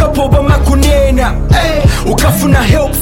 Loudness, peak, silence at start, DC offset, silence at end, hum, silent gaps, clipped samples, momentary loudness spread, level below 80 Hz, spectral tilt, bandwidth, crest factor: -10 LUFS; 0 dBFS; 0 s; under 0.1%; 0 s; none; none; 0.1%; 2 LU; -12 dBFS; -5.5 dB/octave; 17 kHz; 8 dB